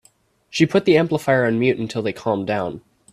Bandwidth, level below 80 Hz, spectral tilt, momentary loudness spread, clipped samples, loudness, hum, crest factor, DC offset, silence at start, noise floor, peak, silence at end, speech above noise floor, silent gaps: 14 kHz; -58 dBFS; -6 dB/octave; 11 LU; under 0.1%; -20 LUFS; none; 20 dB; under 0.1%; 0.55 s; -58 dBFS; 0 dBFS; 0.35 s; 40 dB; none